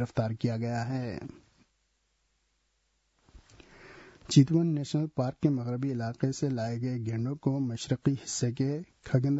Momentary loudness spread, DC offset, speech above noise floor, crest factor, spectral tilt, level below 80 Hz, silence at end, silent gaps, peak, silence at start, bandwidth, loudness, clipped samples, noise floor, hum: 9 LU; under 0.1%; 45 dB; 22 dB; -6.5 dB/octave; -62 dBFS; 0 s; none; -8 dBFS; 0 s; 8 kHz; -30 LUFS; under 0.1%; -75 dBFS; none